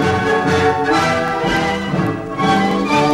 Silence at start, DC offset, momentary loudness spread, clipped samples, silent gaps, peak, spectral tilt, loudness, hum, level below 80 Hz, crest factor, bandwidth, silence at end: 0 s; under 0.1%; 4 LU; under 0.1%; none; -2 dBFS; -5.5 dB/octave; -16 LUFS; none; -40 dBFS; 12 dB; 13.5 kHz; 0 s